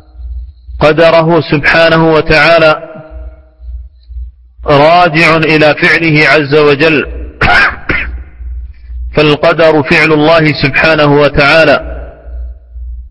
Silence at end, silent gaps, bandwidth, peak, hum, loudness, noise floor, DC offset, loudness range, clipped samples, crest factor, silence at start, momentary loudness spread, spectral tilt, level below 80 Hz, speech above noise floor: 0 s; none; 11 kHz; 0 dBFS; none; -7 LUFS; -28 dBFS; under 0.1%; 3 LU; 1%; 8 dB; 0.15 s; 22 LU; -6.5 dB/octave; -26 dBFS; 22 dB